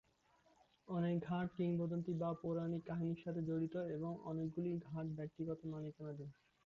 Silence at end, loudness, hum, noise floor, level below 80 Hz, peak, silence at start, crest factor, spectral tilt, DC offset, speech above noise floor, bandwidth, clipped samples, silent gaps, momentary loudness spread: 0.35 s; -43 LUFS; none; -75 dBFS; -74 dBFS; -30 dBFS; 0.85 s; 12 dB; -9 dB/octave; under 0.1%; 32 dB; 6.2 kHz; under 0.1%; none; 8 LU